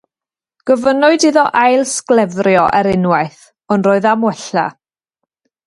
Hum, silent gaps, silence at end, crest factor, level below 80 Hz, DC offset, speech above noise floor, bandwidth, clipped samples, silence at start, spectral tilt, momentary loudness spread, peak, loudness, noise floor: none; none; 0.95 s; 14 dB; -52 dBFS; under 0.1%; 77 dB; 11.5 kHz; under 0.1%; 0.65 s; -5 dB/octave; 7 LU; 0 dBFS; -13 LUFS; -90 dBFS